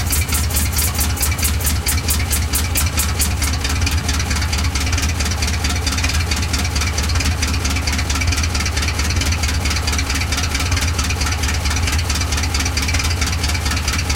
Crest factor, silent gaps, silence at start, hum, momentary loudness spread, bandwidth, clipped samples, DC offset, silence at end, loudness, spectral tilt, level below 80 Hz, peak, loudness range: 16 dB; none; 0 s; none; 2 LU; 17 kHz; under 0.1%; under 0.1%; 0 s; -18 LUFS; -3 dB/octave; -22 dBFS; -2 dBFS; 1 LU